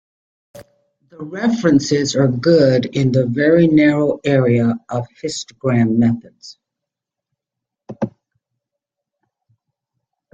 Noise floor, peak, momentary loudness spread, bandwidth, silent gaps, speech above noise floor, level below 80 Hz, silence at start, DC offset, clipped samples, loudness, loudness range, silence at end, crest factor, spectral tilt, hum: -83 dBFS; -2 dBFS; 14 LU; 8.4 kHz; none; 68 dB; -54 dBFS; 0.55 s; under 0.1%; under 0.1%; -16 LUFS; 21 LU; 2.25 s; 16 dB; -6.5 dB/octave; none